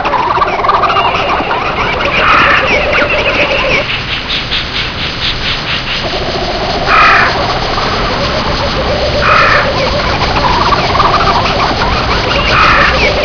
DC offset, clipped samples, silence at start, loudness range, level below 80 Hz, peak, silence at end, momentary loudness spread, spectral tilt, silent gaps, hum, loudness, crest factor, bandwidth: under 0.1%; 0.4%; 0 s; 3 LU; -22 dBFS; 0 dBFS; 0 s; 7 LU; -4.5 dB/octave; none; none; -10 LUFS; 10 dB; 5.4 kHz